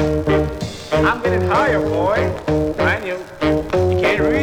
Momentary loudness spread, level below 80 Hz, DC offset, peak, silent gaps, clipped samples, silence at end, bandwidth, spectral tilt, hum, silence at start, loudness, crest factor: 6 LU; -34 dBFS; under 0.1%; -4 dBFS; none; under 0.1%; 0 s; 17.5 kHz; -6.5 dB/octave; none; 0 s; -18 LUFS; 14 dB